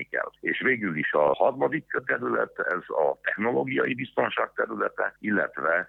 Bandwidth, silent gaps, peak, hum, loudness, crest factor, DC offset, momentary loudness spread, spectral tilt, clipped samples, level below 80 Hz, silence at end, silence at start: 4.1 kHz; none; -8 dBFS; none; -26 LUFS; 18 dB; under 0.1%; 5 LU; -8 dB/octave; under 0.1%; -68 dBFS; 0 s; 0 s